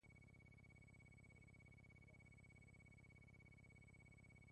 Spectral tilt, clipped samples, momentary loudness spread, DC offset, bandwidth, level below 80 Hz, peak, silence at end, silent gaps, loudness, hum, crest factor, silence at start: -6 dB/octave; under 0.1%; 0 LU; under 0.1%; 10 kHz; -74 dBFS; -56 dBFS; 0 s; none; -67 LUFS; 50 Hz at -75 dBFS; 10 dB; 0 s